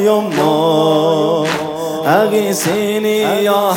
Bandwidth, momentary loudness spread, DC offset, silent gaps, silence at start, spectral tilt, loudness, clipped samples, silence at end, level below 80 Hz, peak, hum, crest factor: 17.5 kHz; 5 LU; under 0.1%; none; 0 s; -4.5 dB/octave; -14 LUFS; under 0.1%; 0 s; -58 dBFS; 0 dBFS; none; 12 dB